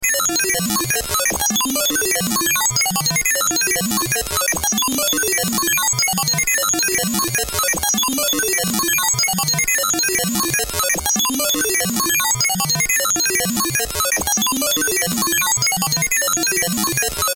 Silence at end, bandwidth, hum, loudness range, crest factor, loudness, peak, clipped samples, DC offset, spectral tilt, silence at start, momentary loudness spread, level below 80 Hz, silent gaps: 0 s; 17.5 kHz; none; 0 LU; 16 dB; -16 LUFS; -4 dBFS; under 0.1%; under 0.1%; -1.5 dB/octave; 0 s; 2 LU; -42 dBFS; none